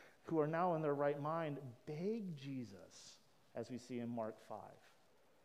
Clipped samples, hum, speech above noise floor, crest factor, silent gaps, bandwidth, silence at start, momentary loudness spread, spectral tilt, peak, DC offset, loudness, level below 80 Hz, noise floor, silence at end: under 0.1%; none; 30 dB; 20 dB; none; 15.5 kHz; 0 s; 18 LU; -7 dB/octave; -24 dBFS; under 0.1%; -43 LUFS; -88 dBFS; -73 dBFS; 0.7 s